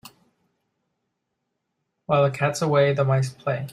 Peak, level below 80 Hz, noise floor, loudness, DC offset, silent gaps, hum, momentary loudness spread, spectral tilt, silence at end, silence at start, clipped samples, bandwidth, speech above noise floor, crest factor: -6 dBFS; -64 dBFS; -79 dBFS; -22 LUFS; under 0.1%; none; none; 6 LU; -6 dB/octave; 0 s; 2.1 s; under 0.1%; 15 kHz; 57 dB; 18 dB